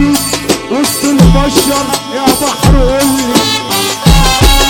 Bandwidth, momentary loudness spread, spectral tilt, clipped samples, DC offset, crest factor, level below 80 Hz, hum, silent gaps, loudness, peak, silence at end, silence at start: 19 kHz; 5 LU; -4 dB/octave; 0.6%; under 0.1%; 8 dB; -16 dBFS; none; none; -9 LUFS; 0 dBFS; 0 s; 0 s